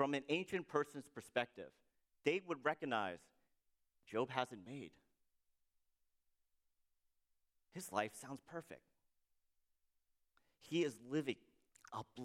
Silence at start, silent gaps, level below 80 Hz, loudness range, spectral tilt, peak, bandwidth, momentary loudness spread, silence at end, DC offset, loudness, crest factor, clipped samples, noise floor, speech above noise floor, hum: 0 s; none; -86 dBFS; 8 LU; -5 dB/octave; -20 dBFS; 15.5 kHz; 15 LU; 0 s; under 0.1%; -43 LUFS; 26 dB; under 0.1%; -83 dBFS; 40 dB; none